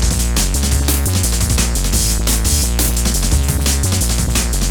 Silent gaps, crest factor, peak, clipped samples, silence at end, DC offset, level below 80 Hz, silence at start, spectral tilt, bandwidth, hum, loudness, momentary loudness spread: none; 14 dB; 0 dBFS; under 0.1%; 0 s; under 0.1%; -18 dBFS; 0 s; -3.5 dB/octave; over 20 kHz; none; -15 LUFS; 1 LU